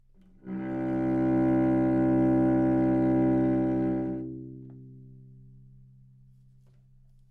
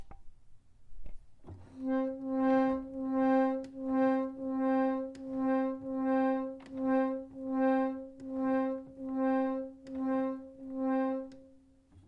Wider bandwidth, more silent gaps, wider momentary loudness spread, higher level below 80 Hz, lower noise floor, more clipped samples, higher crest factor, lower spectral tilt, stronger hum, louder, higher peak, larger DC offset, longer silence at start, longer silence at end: second, 3.3 kHz vs 5 kHz; neither; first, 16 LU vs 11 LU; first, -50 dBFS vs -60 dBFS; second, -57 dBFS vs -61 dBFS; neither; about the same, 12 dB vs 14 dB; first, -11 dB/octave vs -8 dB/octave; neither; first, -26 LUFS vs -33 LUFS; first, -16 dBFS vs -20 dBFS; neither; first, 0.45 s vs 0 s; first, 2.05 s vs 0.05 s